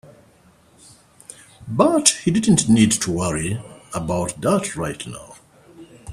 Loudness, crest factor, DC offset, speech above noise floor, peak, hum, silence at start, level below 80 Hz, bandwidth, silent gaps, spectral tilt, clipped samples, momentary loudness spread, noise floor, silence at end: -19 LUFS; 22 dB; under 0.1%; 35 dB; 0 dBFS; none; 1.6 s; -48 dBFS; 14 kHz; none; -4.5 dB/octave; under 0.1%; 19 LU; -53 dBFS; 0 s